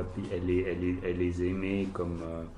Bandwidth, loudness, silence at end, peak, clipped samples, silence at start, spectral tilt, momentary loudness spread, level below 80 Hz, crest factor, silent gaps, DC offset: 10.5 kHz; -32 LUFS; 0 s; -18 dBFS; under 0.1%; 0 s; -8 dB/octave; 5 LU; -44 dBFS; 14 dB; none; under 0.1%